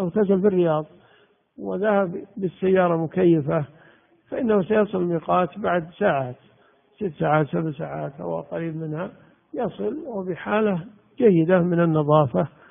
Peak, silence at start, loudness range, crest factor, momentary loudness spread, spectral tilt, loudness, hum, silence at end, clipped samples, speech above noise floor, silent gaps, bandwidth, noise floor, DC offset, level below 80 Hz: -2 dBFS; 0 s; 6 LU; 20 dB; 12 LU; -7.5 dB/octave; -23 LUFS; none; 0.2 s; under 0.1%; 37 dB; none; 3.7 kHz; -59 dBFS; under 0.1%; -62 dBFS